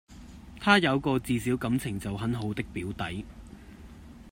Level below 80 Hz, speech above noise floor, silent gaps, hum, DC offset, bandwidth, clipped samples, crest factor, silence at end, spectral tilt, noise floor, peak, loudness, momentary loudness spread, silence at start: -50 dBFS; 20 dB; none; none; under 0.1%; 16 kHz; under 0.1%; 24 dB; 0 s; -5.5 dB/octave; -47 dBFS; -6 dBFS; -28 LUFS; 26 LU; 0.1 s